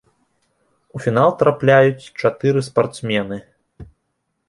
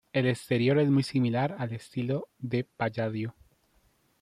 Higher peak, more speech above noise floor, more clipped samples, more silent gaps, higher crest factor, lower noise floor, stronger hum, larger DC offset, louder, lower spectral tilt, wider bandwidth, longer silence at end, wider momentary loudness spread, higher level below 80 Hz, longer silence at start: first, -2 dBFS vs -14 dBFS; first, 56 dB vs 40 dB; neither; neither; about the same, 18 dB vs 16 dB; first, -72 dBFS vs -68 dBFS; neither; neither; first, -17 LUFS vs -29 LUFS; about the same, -6.5 dB/octave vs -7.5 dB/octave; second, 11.5 kHz vs 13.5 kHz; second, 0.65 s vs 0.9 s; first, 13 LU vs 10 LU; first, -54 dBFS vs -68 dBFS; first, 0.95 s vs 0.15 s